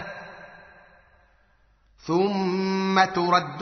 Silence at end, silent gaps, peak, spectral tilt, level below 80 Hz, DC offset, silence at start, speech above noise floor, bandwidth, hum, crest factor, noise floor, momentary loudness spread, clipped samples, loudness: 0 s; none; -6 dBFS; -4 dB/octave; -64 dBFS; under 0.1%; 0 s; 39 dB; 6.4 kHz; none; 20 dB; -61 dBFS; 22 LU; under 0.1%; -23 LUFS